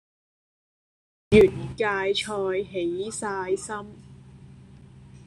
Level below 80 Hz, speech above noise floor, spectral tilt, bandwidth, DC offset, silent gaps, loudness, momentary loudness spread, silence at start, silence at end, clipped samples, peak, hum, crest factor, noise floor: -50 dBFS; 24 dB; -5 dB/octave; 11.5 kHz; under 0.1%; none; -24 LUFS; 13 LU; 1.3 s; 0.1 s; under 0.1%; -4 dBFS; none; 24 dB; -48 dBFS